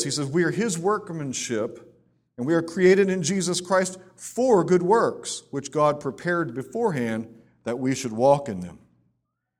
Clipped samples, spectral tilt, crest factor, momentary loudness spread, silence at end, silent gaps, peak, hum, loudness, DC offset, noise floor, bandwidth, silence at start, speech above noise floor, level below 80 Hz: under 0.1%; -5 dB/octave; 18 dB; 13 LU; 0.8 s; none; -6 dBFS; none; -24 LUFS; under 0.1%; -76 dBFS; 14.5 kHz; 0 s; 52 dB; -64 dBFS